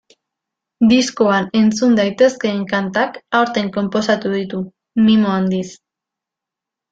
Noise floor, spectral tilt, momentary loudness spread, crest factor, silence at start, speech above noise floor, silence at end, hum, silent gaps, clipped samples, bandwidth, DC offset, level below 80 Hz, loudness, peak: -85 dBFS; -5.5 dB/octave; 9 LU; 16 dB; 0.8 s; 69 dB; 1.15 s; none; none; under 0.1%; 7.8 kHz; under 0.1%; -56 dBFS; -16 LUFS; -2 dBFS